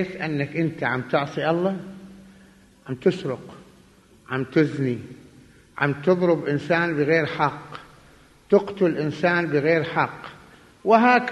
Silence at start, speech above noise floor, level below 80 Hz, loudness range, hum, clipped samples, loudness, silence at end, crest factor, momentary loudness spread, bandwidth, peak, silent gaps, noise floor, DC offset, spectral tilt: 0 s; 31 dB; -60 dBFS; 5 LU; none; under 0.1%; -23 LUFS; 0 s; 20 dB; 16 LU; 12 kHz; -4 dBFS; none; -53 dBFS; under 0.1%; -7.5 dB/octave